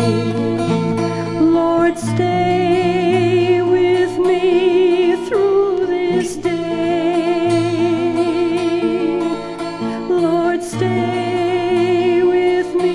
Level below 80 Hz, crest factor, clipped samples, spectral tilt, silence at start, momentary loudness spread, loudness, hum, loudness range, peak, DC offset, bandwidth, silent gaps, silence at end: -50 dBFS; 12 dB; under 0.1%; -6.5 dB/octave; 0 s; 5 LU; -16 LUFS; none; 3 LU; -4 dBFS; under 0.1%; 11.5 kHz; none; 0 s